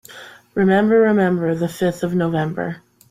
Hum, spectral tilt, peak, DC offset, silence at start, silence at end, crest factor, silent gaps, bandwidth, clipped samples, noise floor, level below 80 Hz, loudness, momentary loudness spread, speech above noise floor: none; -7.5 dB/octave; -4 dBFS; under 0.1%; 0.1 s; 0.35 s; 14 dB; none; 15.5 kHz; under 0.1%; -41 dBFS; -56 dBFS; -18 LUFS; 17 LU; 23 dB